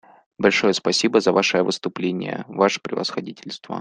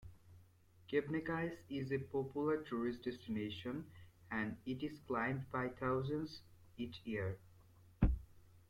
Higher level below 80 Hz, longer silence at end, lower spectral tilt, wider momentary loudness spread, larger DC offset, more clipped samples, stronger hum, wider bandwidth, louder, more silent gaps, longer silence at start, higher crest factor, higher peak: second, -62 dBFS vs -52 dBFS; about the same, 0 s vs 0.1 s; second, -4 dB/octave vs -8 dB/octave; first, 13 LU vs 10 LU; neither; neither; neither; second, 10 kHz vs 16.5 kHz; first, -21 LUFS vs -42 LUFS; neither; first, 0.4 s vs 0 s; about the same, 20 dB vs 22 dB; first, -2 dBFS vs -20 dBFS